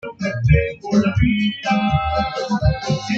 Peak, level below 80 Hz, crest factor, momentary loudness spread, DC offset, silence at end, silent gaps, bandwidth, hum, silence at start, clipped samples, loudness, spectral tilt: -2 dBFS; -30 dBFS; 16 dB; 5 LU; under 0.1%; 0 s; none; 7.8 kHz; none; 0.05 s; under 0.1%; -19 LUFS; -6.5 dB/octave